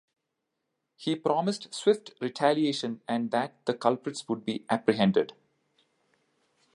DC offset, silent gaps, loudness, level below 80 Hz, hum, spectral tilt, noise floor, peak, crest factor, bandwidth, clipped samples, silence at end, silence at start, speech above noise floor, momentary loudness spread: under 0.1%; none; -29 LUFS; -74 dBFS; none; -5.5 dB/octave; -83 dBFS; -8 dBFS; 22 dB; 11.5 kHz; under 0.1%; 1.45 s; 1 s; 55 dB; 8 LU